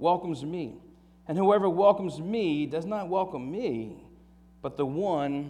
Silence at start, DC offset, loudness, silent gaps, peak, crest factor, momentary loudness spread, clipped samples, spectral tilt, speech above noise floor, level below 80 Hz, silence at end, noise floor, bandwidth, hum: 0 s; under 0.1%; -28 LUFS; none; -10 dBFS; 20 dB; 15 LU; under 0.1%; -7.5 dB/octave; 28 dB; -62 dBFS; 0 s; -55 dBFS; 11 kHz; none